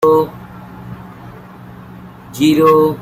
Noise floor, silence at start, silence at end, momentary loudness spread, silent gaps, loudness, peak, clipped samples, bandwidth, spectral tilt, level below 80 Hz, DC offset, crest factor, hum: -35 dBFS; 0 s; 0 s; 25 LU; none; -12 LUFS; -2 dBFS; under 0.1%; 16 kHz; -6.5 dB/octave; -48 dBFS; under 0.1%; 14 dB; none